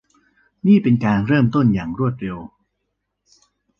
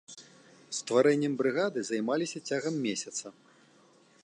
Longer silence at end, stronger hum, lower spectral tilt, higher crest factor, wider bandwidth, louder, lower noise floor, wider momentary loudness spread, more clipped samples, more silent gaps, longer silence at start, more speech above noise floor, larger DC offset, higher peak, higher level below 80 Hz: first, 1.3 s vs 0.9 s; first, 50 Hz at -35 dBFS vs none; first, -9.5 dB/octave vs -4 dB/octave; about the same, 16 dB vs 20 dB; second, 6.6 kHz vs 11 kHz; first, -18 LUFS vs -30 LUFS; first, -75 dBFS vs -62 dBFS; about the same, 14 LU vs 14 LU; neither; neither; first, 0.65 s vs 0.1 s; first, 58 dB vs 32 dB; neither; first, -4 dBFS vs -12 dBFS; first, -48 dBFS vs -82 dBFS